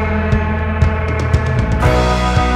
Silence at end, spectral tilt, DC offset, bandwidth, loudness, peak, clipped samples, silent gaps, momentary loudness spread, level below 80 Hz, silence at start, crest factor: 0 s; -6.5 dB/octave; under 0.1%; 11.5 kHz; -15 LUFS; 0 dBFS; under 0.1%; none; 3 LU; -20 dBFS; 0 s; 14 dB